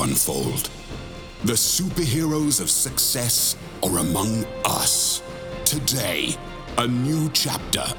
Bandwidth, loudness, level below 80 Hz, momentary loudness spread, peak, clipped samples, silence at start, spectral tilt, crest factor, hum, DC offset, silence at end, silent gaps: over 20 kHz; -21 LUFS; -42 dBFS; 9 LU; -2 dBFS; under 0.1%; 0 s; -3 dB/octave; 22 dB; none; under 0.1%; 0 s; none